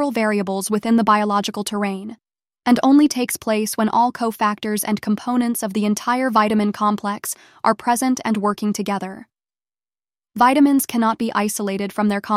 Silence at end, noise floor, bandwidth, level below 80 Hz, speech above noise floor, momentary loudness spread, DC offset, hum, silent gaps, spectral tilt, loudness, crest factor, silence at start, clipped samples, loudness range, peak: 0 s; under -90 dBFS; 16 kHz; -62 dBFS; over 71 dB; 9 LU; under 0.1%; none; none; -4.5 dB/octave; -19 LUFS; 16 dB; 0 s; under 0.1%; 3 LU; -2 dBFS